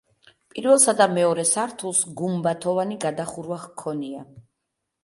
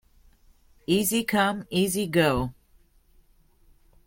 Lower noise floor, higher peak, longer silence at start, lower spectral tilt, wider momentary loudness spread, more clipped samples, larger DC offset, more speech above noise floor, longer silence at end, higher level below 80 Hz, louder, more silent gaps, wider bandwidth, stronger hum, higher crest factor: first, -80 dBFS vs -60 dBFS; first, -2 dBFS vs -8 dBFS; second, 0.55 s vs 0.9 s; about the same, -3.5 dB/octave vs -4.5 dB/octave; first, 16 LU vs 7 LU; neither; neither; first, 58 dB vs 36 dB; second, 0.65 s vs 1.55 s; second, -68 dBFS vs -50 dBFS; first, -22 LUFS vs -25 LUFS; neither; second, 11.5 kHz vs 16.5 kHz; neither; about the same, 20 dB vs 20 dB